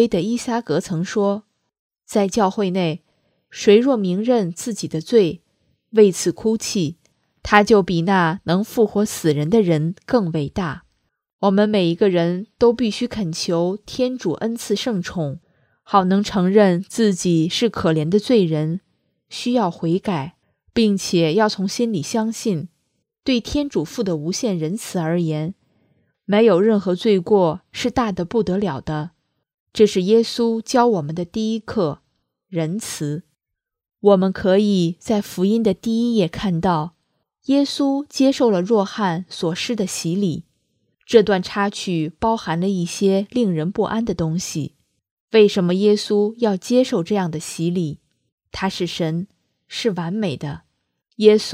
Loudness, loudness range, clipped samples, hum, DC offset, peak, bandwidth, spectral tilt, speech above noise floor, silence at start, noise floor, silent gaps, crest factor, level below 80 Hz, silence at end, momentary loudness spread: -19 LUFS; 4 LU; under 0.1%; none; under 0.1%; 0 dBFS; 15.5 kHz; -5.5 dB/octave; 64 dB; 0 s; -82 dBFS; 1.79-1.90 s, 11.33-11.39 s, 29.54-29.66 s, 45.11-45.28 s, 48.32-48.38 s; 20 dB; -52 dBFS; 0 s; 11 LU